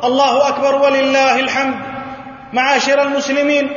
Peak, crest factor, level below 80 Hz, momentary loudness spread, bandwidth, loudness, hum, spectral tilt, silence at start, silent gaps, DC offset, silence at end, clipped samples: -2 dBFS; 14 dB; -56 dBFS; 14 LU; 7.4 kHz; -14 LUFS; none; -3 dB/octave; 0 s; none; under 0.1%; 0 s; under 0.1%